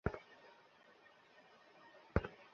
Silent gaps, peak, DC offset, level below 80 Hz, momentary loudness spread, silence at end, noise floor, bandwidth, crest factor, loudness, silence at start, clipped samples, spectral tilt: none; -16 dBFS; under 0.1%; -54 dBFS; 23 LU; 0.1 s; -66 dBFS; 6.8 kHz; 32 dB; -43 LUFS; 0.05 s; under 0.1%; -6.5 dB/octave